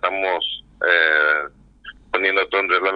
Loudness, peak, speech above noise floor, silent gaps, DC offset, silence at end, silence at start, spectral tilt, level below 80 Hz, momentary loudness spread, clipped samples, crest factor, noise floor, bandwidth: -18 LUFS; -2 dBFS; 24 dB; none; under 0.1%; 0 s; 0.05 s; -4.5 dB/octave; -54 dBFS; 10 LU; under 0.1%; 18 dB; -43 dBFS; 5.4 kHz